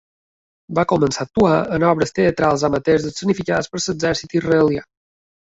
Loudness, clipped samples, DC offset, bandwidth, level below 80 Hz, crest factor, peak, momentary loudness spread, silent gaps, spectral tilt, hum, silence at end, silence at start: -18 LUFS; under 0.1%; under 0.1%; 8 kHz; -46 dBFS; 16 dB; -2 dBFS; 5 LU; none; -5.5 dB/octave; none; 0.6 s; 0.7 s